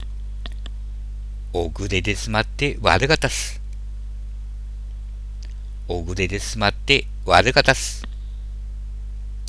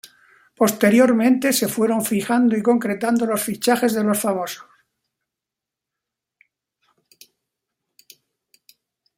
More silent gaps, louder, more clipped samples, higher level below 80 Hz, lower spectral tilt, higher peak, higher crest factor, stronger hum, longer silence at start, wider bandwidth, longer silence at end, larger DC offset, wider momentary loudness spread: neither; about the same, -20 LUFS vs -19 LUFS; neither; first, -30 dBFS vs -66 dBFS; about the same, -4 dB/octave vs -4.5 dB/octave; about the same, 0 dBFS vs -2 dBFS; about the same, 22 dB vs 18 dB; first, 50 Hz at -30 dBFS vs none; second, 0 s vs 0.6 s; second, 11 kHz vs 16.5 kHz; second, 0 s vs 4.55 s; neither; first, 18 LU vs 7 LU